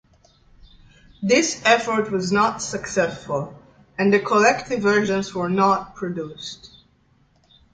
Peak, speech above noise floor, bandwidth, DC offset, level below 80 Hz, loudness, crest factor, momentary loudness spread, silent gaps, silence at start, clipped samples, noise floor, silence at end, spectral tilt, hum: -2 dBFS; 39 dB; 9.4 kHz; under 0.1%; -56 dBFS; -20 LUFS; 20 dB; 14 LU; none; 1.2 s; under 0.1%; -60 dBFS; 1.05 s; -4 dB/octave; none